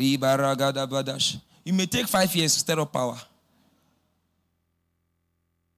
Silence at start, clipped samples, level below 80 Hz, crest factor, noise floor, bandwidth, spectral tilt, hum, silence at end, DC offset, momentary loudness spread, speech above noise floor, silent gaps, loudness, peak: 0 s; under 0.1%; -60 dBFS; 16 dB; -74 dBFS; 16 kHz; -3.5 dB/octave; none; 2.55 s; under 0.1%; 8 LU; 50 dB; none; -24 LUFS; -12 dBFS